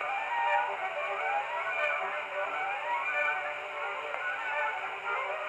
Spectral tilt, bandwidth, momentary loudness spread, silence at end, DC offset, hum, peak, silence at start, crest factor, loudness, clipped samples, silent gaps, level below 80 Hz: -1.5 dB/octave; 13 kHz; 6 LU; 0 s; under 0.1%; none; -16 dBFS; 0 s; 16 dB; -32 LUFS; under 0.1%; none; -82 dBFS